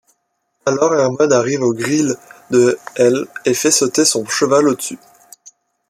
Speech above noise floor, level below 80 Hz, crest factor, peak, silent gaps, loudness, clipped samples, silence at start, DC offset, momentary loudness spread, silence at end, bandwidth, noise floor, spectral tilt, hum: 53 dB; -62 dBFS; 16 dB; -2 dBFS; none; -15 LUFS; under 0.1%; 0.65 s; under 0.1%; 8 LU; 0.95 s; 15.5 kHz; -68 dBFS; -3.5 dB/octave; none